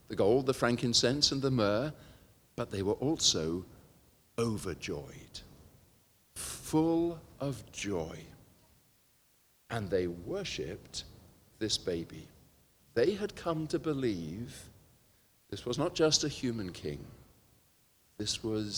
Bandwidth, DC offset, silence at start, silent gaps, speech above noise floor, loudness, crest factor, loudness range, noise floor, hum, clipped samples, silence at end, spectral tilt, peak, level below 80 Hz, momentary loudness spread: over 20 kHz; under 0.1%; 0.1 s; none; 35 dB; -33 LUFS; 24 dB; 9 LU; -68 dBFS; none; under 0.1%; 0 s; -4 dB/octave; -10 dBFS; -60 dBFS; 19 LU